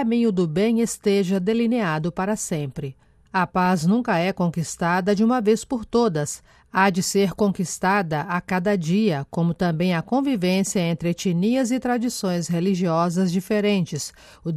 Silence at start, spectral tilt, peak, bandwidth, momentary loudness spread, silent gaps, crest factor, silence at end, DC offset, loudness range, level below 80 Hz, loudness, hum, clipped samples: 0 s; -5.5 dB/octave; -6 dBFS; 14.5 kHz; 5 LU; none; 16 dB; 0 s; under 0.1%; 1 LU; -54 dBFS; -22 LUFS; none; under 0.1%